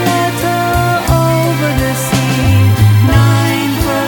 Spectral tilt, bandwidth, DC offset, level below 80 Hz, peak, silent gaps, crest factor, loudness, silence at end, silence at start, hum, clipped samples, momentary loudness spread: -5.5 dB/octave; over 20 kHz; under 0.1%; -26 dBFS; 0 dBFS; none; 10 dB; -11 LUFS; 0 s; 0 s; none; under 0.1%; 5 LU